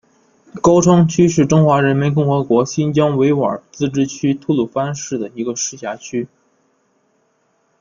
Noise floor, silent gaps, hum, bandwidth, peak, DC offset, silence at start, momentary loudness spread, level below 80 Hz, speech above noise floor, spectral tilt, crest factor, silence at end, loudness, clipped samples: -62 dBFS; none; none; 7.4 kHz; -2 dBFS; under 0.1%; 0.55 s; 12 LU; -50 dBFS; 47 dB; -6.5 dB/octave; 16 dB; 1.55 s; -16 LUFS; under 0.1%